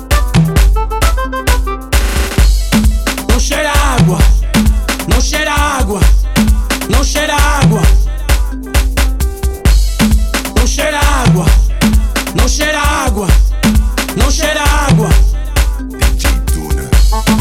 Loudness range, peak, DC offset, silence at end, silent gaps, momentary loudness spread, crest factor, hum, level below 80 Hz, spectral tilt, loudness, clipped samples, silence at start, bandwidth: 1 LU; 0 dBFS; under 0.1%; 0 s; none; 5 LU; 10 dB; none; -12 dBFS; -4.5 dB/octave; -12 LUFS; under 0.1%; 0 s; 16 kHz